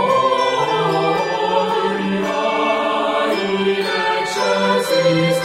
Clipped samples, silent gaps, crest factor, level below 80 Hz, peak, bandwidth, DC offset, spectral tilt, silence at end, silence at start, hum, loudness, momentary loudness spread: under 0.1%; none; 14 dB; -58 dBFS; -4 dBFS; 16 kHz; under 0.1%; -4.5 dB/octave; 0 s; 0 s; none; -17 LUFS; 3 LU